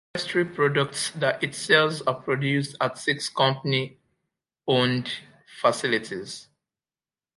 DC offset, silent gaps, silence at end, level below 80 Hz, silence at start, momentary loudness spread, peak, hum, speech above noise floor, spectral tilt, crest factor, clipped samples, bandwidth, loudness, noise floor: under 0.1%; none; 0.95 s; -70 dBFS; 0.15 s; 14 LU; -4 dBFS; none; over 65 dB; -4.5 dB/octave; 22 dB; under 0.1%; 11.5 kHz; -24 LUFS; under -90 dBFS